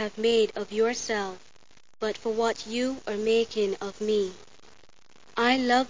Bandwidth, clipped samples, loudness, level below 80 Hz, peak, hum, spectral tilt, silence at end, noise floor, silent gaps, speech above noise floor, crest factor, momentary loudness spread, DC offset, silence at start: 7.6 kHz; under 0.1%; -27 LUFS; -62 dBFS; -10 dBFS; none; -3.5 dB/octave; 0 s; -59 dBFS; none; 32 dB; 18 dB; 10 LU; 0.4%; 0 s